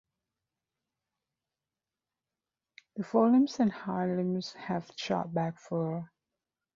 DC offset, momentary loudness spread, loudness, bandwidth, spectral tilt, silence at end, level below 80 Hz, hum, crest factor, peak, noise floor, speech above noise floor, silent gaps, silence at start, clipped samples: under 0.1%; 14 LU; -31 LUFS; 7.4 kHz; -7 dB/octave; 0.7 s; -74 dBFS; none; 20 dB; -12 dBFS; under -90 dBFS; over 60 dB; none; 2.95 s; under 0.1%